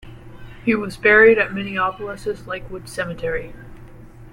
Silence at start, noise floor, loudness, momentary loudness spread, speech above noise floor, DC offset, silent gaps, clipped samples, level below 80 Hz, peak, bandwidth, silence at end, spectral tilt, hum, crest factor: 0.05 s; -40 dBFS; -19 LUFS; 18 LU; 21 dB; under 0.1%; none; under 0.1%; -42 dBFS; -2 dBFS; 12.5 kHz; 0.05 s; -5.5 dB/octave; none; 18 dB